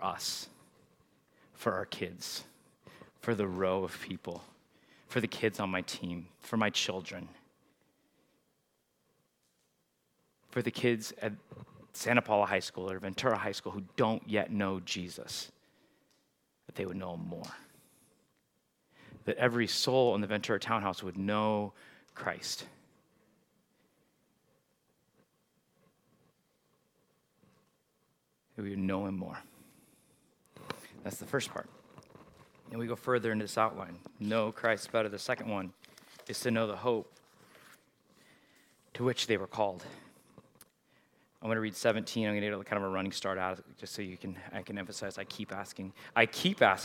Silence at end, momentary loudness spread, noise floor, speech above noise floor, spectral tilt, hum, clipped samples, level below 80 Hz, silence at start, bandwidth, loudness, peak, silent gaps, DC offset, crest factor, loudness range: 0 s; 16 LU; -77 dBFS; 43 dB; -4.5 dB/octave; none; under 0.1%; -78 dBFS; 0 s; 17.5 kHz; -34 LUFS; -8 dBFS; none; under 0.1%; 28 dB; 10 LU